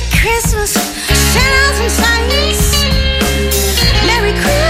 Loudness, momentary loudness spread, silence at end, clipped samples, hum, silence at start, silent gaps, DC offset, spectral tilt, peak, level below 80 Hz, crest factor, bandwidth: -11 LUFS; 4 LU; 0 s; under 0.1%; none; 0 s; none; under 0.1%; -3 dB/octave; 0 dBFS; -16 dBFS; 12 dB; 16.5 kHz